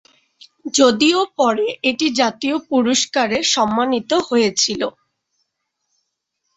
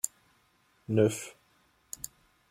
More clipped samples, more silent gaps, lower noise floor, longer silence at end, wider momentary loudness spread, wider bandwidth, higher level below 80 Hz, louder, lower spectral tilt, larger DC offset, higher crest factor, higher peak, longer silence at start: neither; neither; first, -74 dBFS vs -68 dBFS; first, 1.65 s vs 1.2 s; second, 6 LU vs 19 LU; second, 8.2 kHz vs 16.5 kHz; first, -60 dBFS vs -68 dBFS; first, -17 LUFS vs -31 LUFS; second, -2.5 dB/octave vs -5.5 dB/octave; neither; second, 18 dB vs 24 dB; first, -2 dBFS vs -10 dBFS; first, 0.65 s vs 0.05 s